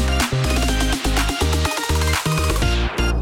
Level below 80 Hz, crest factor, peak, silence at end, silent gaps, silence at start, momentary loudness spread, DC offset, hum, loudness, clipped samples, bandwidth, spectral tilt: -22 dBFS; 14 dB; -4 dBFS; 0 s; none; 0 s; 1 LU; under 0.1%; none; -20 LUFS; under 0.1%; 17.5 kHz; -4 dB/octave